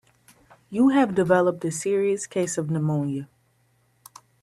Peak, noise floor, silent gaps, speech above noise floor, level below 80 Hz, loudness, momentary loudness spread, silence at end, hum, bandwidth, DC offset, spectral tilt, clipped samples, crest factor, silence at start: -6 dBFS; -65 dBFS; none; 43 dB; -64 dBFS; -23 LUFS; 9 LU; 1.2 s; none; 14 kHz; under 0.1%; -6 dB/octave; under 0.1%; 20 dB; 0.7 s